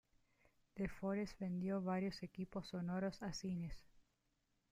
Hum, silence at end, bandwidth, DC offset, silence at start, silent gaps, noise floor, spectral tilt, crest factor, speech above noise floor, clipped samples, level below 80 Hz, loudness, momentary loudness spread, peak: none; 0.7 s; 10.5 kHz; under 0.1%; 0.75 s; none; -84 dBFS; -6.5 dB/octave; 14 dB; 40 dB; under 0.1%; -64 dBFS; -45 LUFS; 7 LU; -30 dBFS